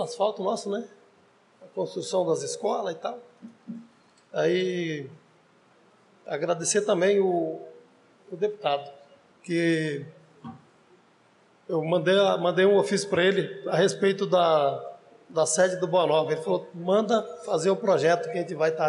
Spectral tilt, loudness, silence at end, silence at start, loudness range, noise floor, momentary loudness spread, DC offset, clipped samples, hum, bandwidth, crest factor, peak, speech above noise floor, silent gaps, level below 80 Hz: -4.5 dB/octave; -25 LUFS; 0 s; 0 s; 8 LU; -61 dBFS; 19 LU; under 0.1%; under 0.1%; none; 11.5 kHz; 14 dB; -12 dBFS; 36 dB; none; -80 dBFS